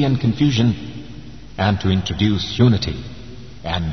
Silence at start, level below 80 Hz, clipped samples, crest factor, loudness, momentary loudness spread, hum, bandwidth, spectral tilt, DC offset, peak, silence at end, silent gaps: 0 s; -38 dBFS; under 0.1%; 16 dB; -19 LUFS; 20 LU; none; 6.4 kHz; -6.5 dB/octave; 1%; -4 dBFS; 0 s; none